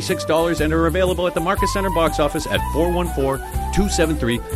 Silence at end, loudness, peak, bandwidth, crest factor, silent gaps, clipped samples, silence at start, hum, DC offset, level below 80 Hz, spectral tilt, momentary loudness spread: 0 s; -20 LUFS; -4 dBFS; 16 kHz; 16 dB; none; under 0.1%; 0 s; none; under 0.1%; -28 dBFS; -5 dB/octave; 4 LU